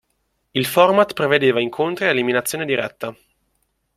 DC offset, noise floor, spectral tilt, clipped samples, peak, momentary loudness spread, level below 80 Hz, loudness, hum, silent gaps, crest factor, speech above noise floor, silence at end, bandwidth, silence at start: under 0.1%; -70 dBFS; -4 dB/octave; under 0.1%; -2 dBFS; 12 LU; -60 dBFS; -18 LUFS; none; none; 18 dB; 51 dB; 0.85 s; 16.5 kHz; 0.55 s